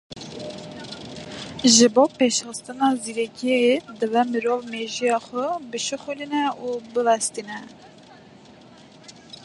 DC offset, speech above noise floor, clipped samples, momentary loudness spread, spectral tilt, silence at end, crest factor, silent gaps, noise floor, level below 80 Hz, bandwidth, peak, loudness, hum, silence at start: under 0.1%; 26 dB; under 0.1%; 19 LU; -2.5 dB/octave; 0 s; 22 dB; none; -47 dBFS; -64 dBFS; 11.5 kHz; -2 dBFS; -22 LUFS; none; 0.1 s